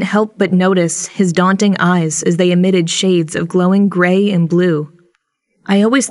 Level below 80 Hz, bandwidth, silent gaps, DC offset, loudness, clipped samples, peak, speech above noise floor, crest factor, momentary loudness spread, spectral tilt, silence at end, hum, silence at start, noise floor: -62 dBFS; 11.5 kHz; none; under 0.1%; -13 LUFS; under 0.1%; 0 dBFS; 52 dB; 14 dB; 4 LU; -5.5 dB/octave; 0 s; none; 0 s; -64 dBFS